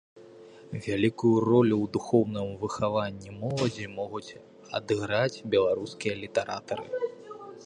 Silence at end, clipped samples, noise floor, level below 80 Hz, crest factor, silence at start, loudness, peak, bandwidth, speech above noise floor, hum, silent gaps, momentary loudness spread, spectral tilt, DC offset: 0 s; under 0.1%; -50 dBFS; -60 dBFS; 20 dB; 0.15 s; -28 LUFS; -10 dBFS; 10.5 kHz; 22 dB; none; none; 13 LU; -6.5 dB/octave; under 0.1%